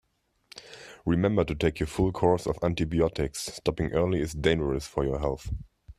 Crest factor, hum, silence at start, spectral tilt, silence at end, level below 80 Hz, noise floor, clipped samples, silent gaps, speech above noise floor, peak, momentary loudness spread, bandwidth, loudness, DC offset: 20 dB; none; 0.55 s; -6 dB/octave; 0.05 s; -42 dBFS; -62 dBFS; under 0.1%; none; 35 dB; -8 dBFS; 14 LU; 14 kHz; -28 LUFS; under 0.1%